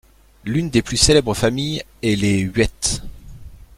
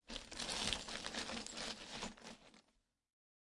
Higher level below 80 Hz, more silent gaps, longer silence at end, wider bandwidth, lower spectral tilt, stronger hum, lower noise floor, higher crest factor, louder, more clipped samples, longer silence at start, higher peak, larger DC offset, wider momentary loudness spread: first, -34 dBFS vs -64 dBFS; neither; second, 0.2 s vs 0.9 s; first, 16 kHz vs 11.5 kHz; first, -4 dB/octave vs -1.5 dB/octave; neither; second, -38 dBFS vs -81 dBFS; second, 18 dB vs 30 dB; first, -18 LUFS vs -44 LUFS; neither; first, 0.45 s vs 0.05 s; first, -2 dBFS vs -18 dBFS; neither; second, 10 LU vs 14 LU